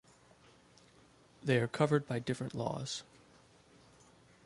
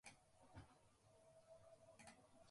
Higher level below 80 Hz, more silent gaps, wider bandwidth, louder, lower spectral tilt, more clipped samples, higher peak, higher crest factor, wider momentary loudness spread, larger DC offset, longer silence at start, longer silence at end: first, -72 dBFS vs -82 dBFS; neither; about the same, 11.5 kHz vs 11.5 kHz; first, -35 LUFS vs -67 LUFS; first, -6 dB/octave vs -4 dB/octave; neither; first, -16 dBFS vs -46 dBFS; about the same, 22 dB vs 20 dB; first, 11 LU vs 3 LU; neither; first, 1.45 s vs 0.05 s; first, 1.45 s vs 0 s